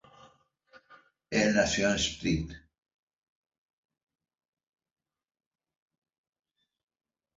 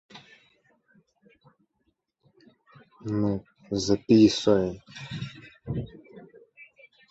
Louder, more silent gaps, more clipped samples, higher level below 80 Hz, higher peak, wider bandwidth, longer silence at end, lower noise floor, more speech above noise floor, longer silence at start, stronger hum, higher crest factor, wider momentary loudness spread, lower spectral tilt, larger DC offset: second, -28 LUFS vs -25 LUFS; neither; neither; about the same, -54 dBFS vs -56 dBFS; second, -10 dBFS vs -6 dBFS; about the same, 7.8 kHz vs 8 kHz; first, 4.8 s vs 0.45 s; second, -63 dBFS vs -75 dBFS; second, 35 dB vs 52 dB; first, 0.9 s vs 0.15 s; neither; about the same, 24 dB vs 22 dB; second, 8 LU vs 22 LU; second, -4 dB/octave vs -6 dB/octave; neither